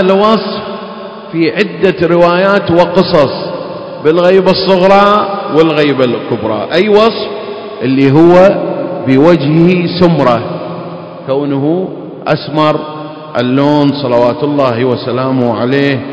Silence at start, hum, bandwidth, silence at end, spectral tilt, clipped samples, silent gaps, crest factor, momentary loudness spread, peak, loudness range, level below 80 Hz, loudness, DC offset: 0 s; none; 8 kHz; 0 s; -8 dB/octave; 2%; none; 10 dB; 14 LU; 0 dBFS; 4 LU; -44 dBFS; -10 LUFS; under 0.1%